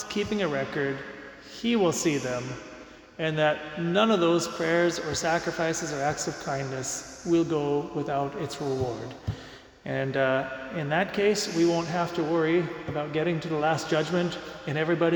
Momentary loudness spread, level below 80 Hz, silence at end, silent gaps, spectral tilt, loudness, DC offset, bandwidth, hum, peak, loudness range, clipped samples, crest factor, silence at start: 12 LU; -56 dBFS; 0 s; none; -5 dB/octave; -27 LUFS; under 0.1%; 19 kHz; none; -10 dBFS; 4 LU; under 0.1%; 18 dB; 0 s